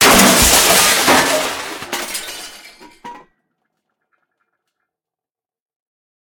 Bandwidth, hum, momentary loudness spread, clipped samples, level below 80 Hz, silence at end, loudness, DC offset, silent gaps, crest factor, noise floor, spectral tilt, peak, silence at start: 19.5 kHz; none; 19 LU; under 0.1%; -36 dBFS; 3 s; -11 LUFS; under 0.1%; none; 16 dB; -90 dBFS; -1.5 dB/octave; 0 dBFS; 0 s